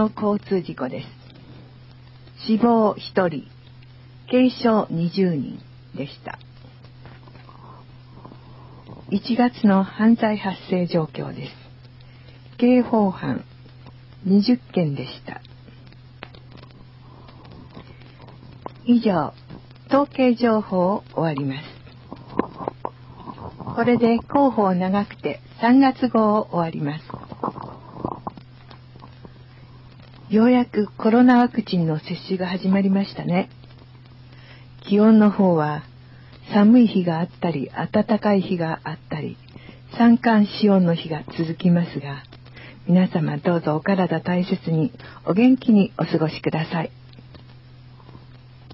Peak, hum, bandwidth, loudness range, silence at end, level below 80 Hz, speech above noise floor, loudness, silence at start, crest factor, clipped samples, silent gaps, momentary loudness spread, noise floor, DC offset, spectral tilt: -6 dBFS; none; 5.8 kHz; 8 LU; 0 s; -54 dBFS; 25 dB; -20 LUFS; 0 s; 16 dB; under 0.1%; none; 20 LU; -45 dBFS; under 0.1%; -10.5 dB/octave